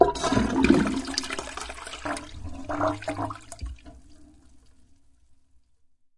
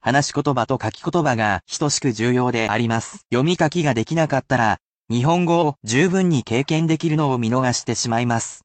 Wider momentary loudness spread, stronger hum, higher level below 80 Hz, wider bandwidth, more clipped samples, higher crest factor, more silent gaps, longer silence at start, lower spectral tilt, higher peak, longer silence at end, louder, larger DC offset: first, 19 LU vs 4 LU; neither; first, -44 dBFS vs -54 dBFS; first, 11.5 kHz vs 9 kHz; neither; first, 26 dB vs 14 dB; second, none vs 4.82-5.05 s; about the same, 0 s vs 0.05 s; about the same, -5 dB/octave vs -5 dB/octave; about the same, -2 dBFS vs -4 dBFS; first, 0.3 s vs 0.1 s; second, -27 LUFS vs -20 LUFS; first, 0.1% vs under 0.1%